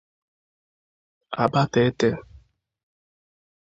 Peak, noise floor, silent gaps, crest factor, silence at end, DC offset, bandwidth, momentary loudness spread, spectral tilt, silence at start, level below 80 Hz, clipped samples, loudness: -2 dBFS; -54 dBFS; none; 24 dB; 1.4 s; under 0.1%; 7.8 kHz; 14 LU; -6.5 dB/octave; 1.3 s; -56 dBFS; under 0.1%; -22 LUFS